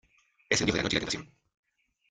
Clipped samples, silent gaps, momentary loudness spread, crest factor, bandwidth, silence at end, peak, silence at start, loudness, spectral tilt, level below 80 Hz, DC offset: under 0.1%; none; 9 LU; 24 dB; 10.5 kHz; 0.85 s; -10 dBFS; 0.5 s; -29 LUFS; -3 dB/octave; -54 dBFS; under 0.1%